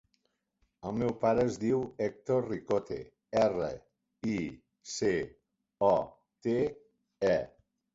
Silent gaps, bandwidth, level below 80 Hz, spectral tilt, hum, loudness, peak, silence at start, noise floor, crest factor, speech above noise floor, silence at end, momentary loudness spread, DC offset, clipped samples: none; 8 kHz; -60 dBFS; -6 dB/octave; none; -32 LUFS; -14 dBFS; 0.85 s; -78 dBFS; 20 dB; 47 dB; 0.45 s; 14 LU; under 0.1%; under 0.1%